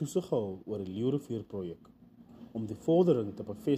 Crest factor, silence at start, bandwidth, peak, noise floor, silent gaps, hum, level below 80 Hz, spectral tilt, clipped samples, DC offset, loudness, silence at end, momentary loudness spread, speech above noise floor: 18 dB; 0 s; 14 kHz; -14 dBFS; -53 dBFS; none; none; -68 dBFS; -8 dB/octave; under 0.1%; under 0.1%; -32 LUFS; 0 s; 15 LU; 22 dB